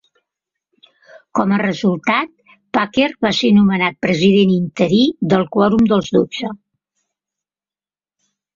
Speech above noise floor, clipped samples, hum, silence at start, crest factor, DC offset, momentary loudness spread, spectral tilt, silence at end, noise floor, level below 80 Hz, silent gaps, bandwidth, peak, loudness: over 75 dB; under 0.1%; 50 Hz at -35 dBFS; 1.35 s; 16 dB; under 0.1%; 9 LU; -6.5 dB/octave; 2 s; under -90 dBFS; -52 dBFS; none; 7.4 kHz; -2 dBFS; -15 LUFS